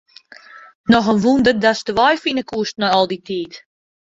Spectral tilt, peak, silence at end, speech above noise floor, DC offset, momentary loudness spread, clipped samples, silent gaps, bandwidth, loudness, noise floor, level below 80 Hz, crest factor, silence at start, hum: -5 dB/octave; -2 dBFS; 0.55 s; 27 dB; under 0.1%; 12 LU; under 0.1%; 0.75-0.84 s; 7.8 kHz; -17 LUFS; -43 dBFS; -52 dBFS; 16 dB; 0.55 s; none